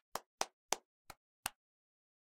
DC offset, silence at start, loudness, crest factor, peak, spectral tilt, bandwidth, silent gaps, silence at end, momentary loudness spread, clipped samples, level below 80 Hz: under 0.1%; 0.15 s; -44 LUFS; 36 dB; -12 dBFS; 0 dB/octave; 16.5 kHz; 0.26-0.38 s, 0.53-0.69 s, 0.85-1.05 s, 1.17-1.43 s; 0.8 s; 19 LU; under 0.1%; -76 dBFS